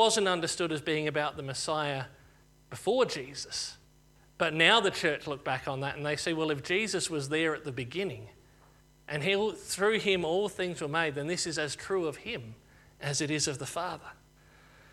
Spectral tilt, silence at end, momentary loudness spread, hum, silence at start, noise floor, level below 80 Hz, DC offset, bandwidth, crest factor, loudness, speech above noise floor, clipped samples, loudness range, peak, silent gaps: -3.5 dB/octave; 0.8 s; 12 LU; none; 0 s; -61 dBFS; -64 dBFS; under 0.1%; 15 kHz; 24 dB; -30 LUFS; 30 dB; under 0.1%; 5 LU; -8 dBFS; none